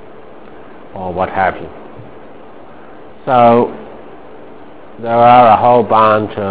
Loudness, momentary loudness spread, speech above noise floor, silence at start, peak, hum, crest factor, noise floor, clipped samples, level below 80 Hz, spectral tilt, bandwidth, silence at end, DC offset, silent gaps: -11 LUFS; 25 LU; 26 dB; 0.95 s; 0 dBFS; none; 14 dB; -37 dBFS; 0.6%; -44 dBFS; -10 dB/octave; 4 kHz; 0 s; 2%; none